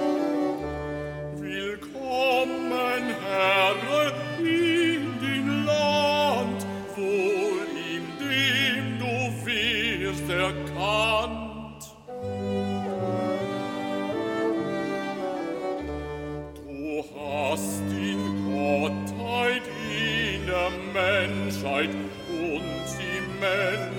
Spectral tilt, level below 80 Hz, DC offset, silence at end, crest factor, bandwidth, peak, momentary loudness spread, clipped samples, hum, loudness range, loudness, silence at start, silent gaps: -4.5 dB/octave; -50 dBFS; under 0.1%; 0 s; 18 dB; 16.5 kHz; -10 dBFS; 11 LU; under 0.1%; none; 6 LU; -26 LUFS; 0 s; none